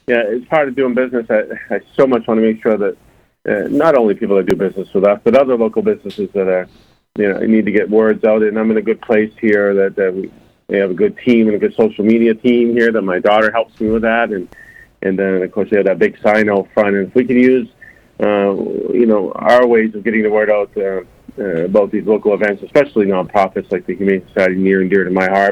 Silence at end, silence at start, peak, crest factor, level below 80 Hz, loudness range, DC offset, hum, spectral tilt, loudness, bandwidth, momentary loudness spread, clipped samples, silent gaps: 0 s; 0.1 s; 0 dBFS; 14 dB; -50 dBFS; 2 LU; under 0.1%; none; -7.5 dB/octave; -14 LUFS; 8.8 kHz; 8 LU; under 0.1%; none